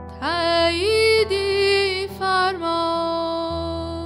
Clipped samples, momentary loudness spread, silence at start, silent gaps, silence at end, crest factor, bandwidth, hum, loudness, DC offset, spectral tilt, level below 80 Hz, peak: under 0.1%; 8 LU; 0 s; none; 0 s; 12 dB; 16 kHz; none; -20 LUFS; under 0.1%; -4 dB/octave; -42 dBFS; -8 dBFS